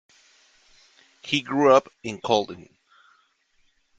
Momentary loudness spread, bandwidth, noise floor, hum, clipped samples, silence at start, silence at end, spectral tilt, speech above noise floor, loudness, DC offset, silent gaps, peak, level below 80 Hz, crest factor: 21 LU; 9 kHz; -66 dBFS; none; under 0.1%; 1.25 s; 1.35 s; -4.5 dB/octave; 44 dB; -22 LUFS; under 0.1%; none; -4 dBFS; -66 dBFS; 22 dB